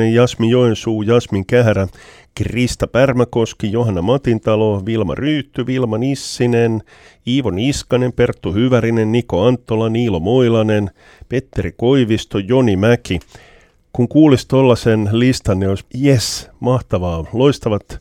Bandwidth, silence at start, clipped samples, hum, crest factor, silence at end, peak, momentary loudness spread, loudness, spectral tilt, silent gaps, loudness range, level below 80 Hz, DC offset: 15 kHz; 0 s; under 0.1%; none; 16 dB; 0 s; 0 dBFS; 8 LU; -16 LUFS; -6.5 dB/octave; none; 3 LU; -38 dBFS; under 0.1%